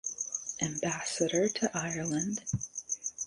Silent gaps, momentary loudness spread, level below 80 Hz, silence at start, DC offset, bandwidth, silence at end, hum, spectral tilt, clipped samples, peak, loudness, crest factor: none; 7 LU; -62 dBFS; 0.05 s; under 0.1%; 11.5 kHz; 0 s; none; -3.5 dB/octave; under 0.1%; -14 dBFS; -33 LUFS; 20 dB